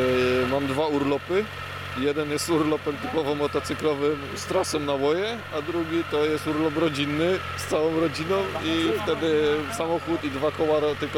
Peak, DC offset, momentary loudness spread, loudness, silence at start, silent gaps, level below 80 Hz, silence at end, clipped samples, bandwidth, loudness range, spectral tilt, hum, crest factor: -12 dBFS; under 0.1%; 5 LU; -25 LUFS; 0 s; none; -54 dBFS; 0 s; under 0.1%; 17 kHz; 1 LU; -5 dB/octave; none; 12 dB